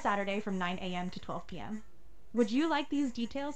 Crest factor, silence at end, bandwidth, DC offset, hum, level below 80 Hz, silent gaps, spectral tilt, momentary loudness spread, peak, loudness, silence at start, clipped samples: 18 dB; 0 s; 9 kHz; 0.8%; none; -60 dBFS; none; -5.5 dB/octave; 12 LU; -16 dBFS; -35 LUFS; 0 s; under 0.1%